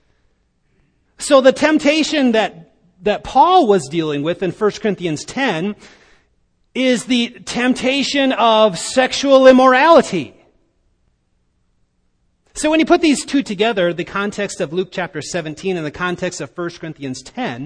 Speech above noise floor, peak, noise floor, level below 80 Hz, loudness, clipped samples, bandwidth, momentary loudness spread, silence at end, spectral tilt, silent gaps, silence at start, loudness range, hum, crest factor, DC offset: 48 dB; 0 dBFS; -63 dBFS; -50 dBFS; -15 LUFS; under 0.1%; 10.5 kHz; 15 LU; 0 s; -4 dB/octave; none; 1.2 s; 8 LU; none; 16 dB; under 0.1%